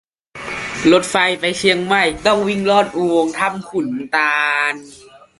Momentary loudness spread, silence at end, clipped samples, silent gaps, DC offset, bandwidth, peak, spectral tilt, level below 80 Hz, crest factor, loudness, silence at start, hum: 10 LU; 0.25 s; under 0.1%; none; under 0.1%; 11.5 kHz; 0 dBFS; -4 dB/octave; -50 dBFS; 16 dB; -16 LUFS; 0.35 s; none